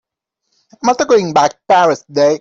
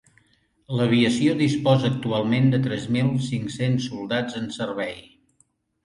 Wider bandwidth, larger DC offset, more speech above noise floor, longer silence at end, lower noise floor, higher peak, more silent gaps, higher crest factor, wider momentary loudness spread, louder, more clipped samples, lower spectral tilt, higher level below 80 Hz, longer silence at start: second, 7.8 kHz vs 11 kHz; neither; first, 60 dB vs 43 dB; second, 0.05 s vs 0.85 s; first, -72 dBFS vs -65 dBFS; first, -2 dBFS vs -6 dBFS; neither; second, 12 dB vs 18 dB; second, 5 LU vs 10 LU; first, -13 LUFS vs -23 LUFS; neither; second, -4 dB/octave vs -6.5 dB/octave; about the same, -58 dBFS vs -58 dBFS; first, 0.85 s vs 0.7 s